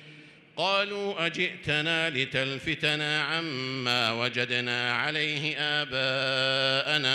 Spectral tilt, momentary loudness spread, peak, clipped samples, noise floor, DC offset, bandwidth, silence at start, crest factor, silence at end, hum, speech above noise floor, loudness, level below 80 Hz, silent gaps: -3.5 dB/octave; 5 LU; -10 dBFS; under 0.1%; -51 dBFS; under 0.1%; 15.5 kHz; 0 s; 18 dB; 0 s; none; 23 dB; -27 LUFS; -66 dBFS; none